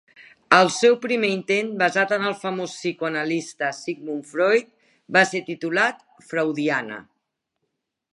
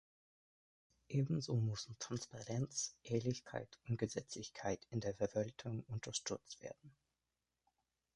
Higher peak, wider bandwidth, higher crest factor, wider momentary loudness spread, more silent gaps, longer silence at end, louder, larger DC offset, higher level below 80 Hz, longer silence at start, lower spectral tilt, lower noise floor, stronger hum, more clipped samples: first, 0 dBFS vs -24 dBFS; about the same, 11.5 kHz vs 11 kHz; about the same, 22 dB vs 20 dB; about the same, 12 LU vs 10 LU; neither; second, 1.1 s vs 1.25 s; first, -22 LUFS vs -43 LUFS; neither; second, -76 dBFS vs -70 dBFS; second, 0.2 s vs 1.1 s; about the same, -4 dB/octave vs -5 dB/octave; second, -78 dBFS vs under -90 dBFS; neither; neither